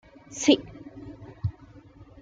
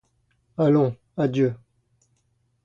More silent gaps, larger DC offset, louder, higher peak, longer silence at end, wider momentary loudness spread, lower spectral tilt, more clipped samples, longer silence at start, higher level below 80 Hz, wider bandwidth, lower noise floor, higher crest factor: neither; neither; second, -26 LUFS vs -23 LUFS; about the same, -6 dBFS vs -8 dBFS; second, 0.7 s vs 1.1 s; first, 22 LU vs 15 LU; second, -4.5 dB/octave vs -9.5 dB/octave; neither; second, 0.3 s vs 0.6 s; first, -54 dBFS vs -64 dBFS; first, 9.4 kHz vs 7.4 kHz; second, -50 dBFS vs -69 dBFS; first, 22 dB vs 16 dB